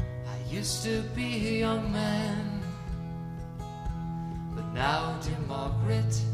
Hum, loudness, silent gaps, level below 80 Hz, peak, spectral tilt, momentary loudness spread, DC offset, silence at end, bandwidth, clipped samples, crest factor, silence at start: none; -32 LUFS; none; -44 dBFS; -12 dBFS; -5.5 dB/octave; 10 LU; under 0.1%; 0 s; 15 kHz; under 0.1%; 18 dB; 0 s